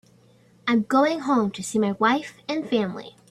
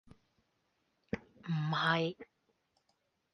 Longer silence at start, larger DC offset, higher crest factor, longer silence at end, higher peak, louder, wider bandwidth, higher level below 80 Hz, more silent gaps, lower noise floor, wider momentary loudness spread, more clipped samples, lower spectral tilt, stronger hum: second, 0.65 s vs 1.15 s; neither; second, 16 dB vs 22 dB; second, 0.2 s vs 1.1 s; first, -8 dBFS vs -18 dBFS; first, -23 LUFS vs -35 LUFS; first, 13 kHz vs 6.6 kHz; about the same, -66 dBFS vs -70 dBFS; neither; second, -56 dBFS vs -79 dBFS; second, 10 LU vs 13 LU; neither; second, -5 dB/octave vs -6.5 dB/octave; neither